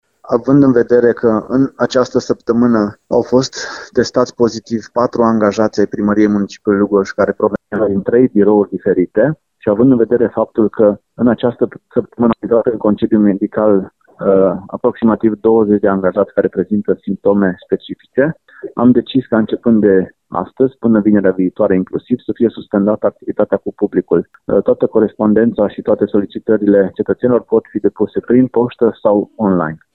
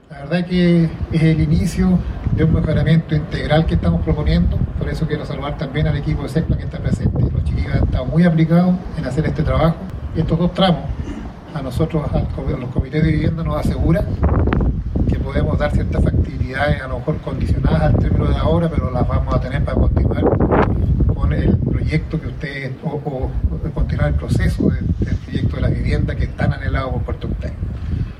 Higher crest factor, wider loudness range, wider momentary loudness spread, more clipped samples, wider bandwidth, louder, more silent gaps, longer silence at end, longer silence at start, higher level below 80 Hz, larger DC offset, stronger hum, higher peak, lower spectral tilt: about the same, 14 dB vs 18 dB; about the same, 2 LU vs 4 LU; about the same, 7 LU vs 8 LU; neither; second, 7.4 kHz vs 11 kHz; first, -14 LUFS vs -18 LUFS; neither; first, 0.2 s vs 0 s; first, 0.25 s vs 0.1 s; second, -48 dBFS vs -24 dBFS; neither; neither; about the same, 0 dBFS vs 0 dBFS; about the same, -7.5 dB/octave vs -8.5 dB/octave